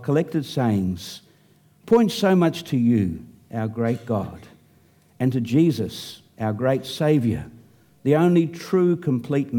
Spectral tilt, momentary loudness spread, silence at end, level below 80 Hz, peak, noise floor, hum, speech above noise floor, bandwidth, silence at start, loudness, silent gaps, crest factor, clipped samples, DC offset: -7.5 dB/octave; 14 LU; 0 s; -56 dBFS; -6 dBFS; -57 dBFS; none; 36 dB; 18 kHz; 0 s; -22 LUFS; none; 16 dB; under 0.1%; under 0.1%